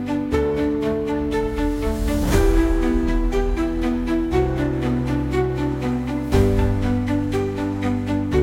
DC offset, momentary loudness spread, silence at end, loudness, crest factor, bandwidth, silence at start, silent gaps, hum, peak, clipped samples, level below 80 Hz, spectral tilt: under 0.1%; 4 LU; 0 s; -21 LUFS; 16 dB; 17 kHz; 0 s; none; none; -4 dBFS; under 0.1%; -26 dBFS; -7 dB/octave